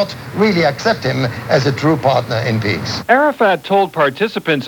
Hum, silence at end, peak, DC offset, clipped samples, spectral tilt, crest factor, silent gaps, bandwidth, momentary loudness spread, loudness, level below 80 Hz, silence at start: none; 0 s; 0 dBFS; under 0.1%; under 0.1%; -6 dB/octave; 16 dB; none; 19.5 kHz; 5 LU; -15 LUFS; -48 dBFS; 0 s